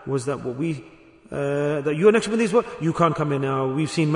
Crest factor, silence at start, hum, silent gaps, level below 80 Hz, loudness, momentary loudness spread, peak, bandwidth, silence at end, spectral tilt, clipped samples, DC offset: 18 dB; 0 s; none; none; -58 dBFS; -22 LUFS; 10 LU; -4 dBFS; 11 kHz; 0 s; -6.5 dB/octave; under 0.1%; under 0.1%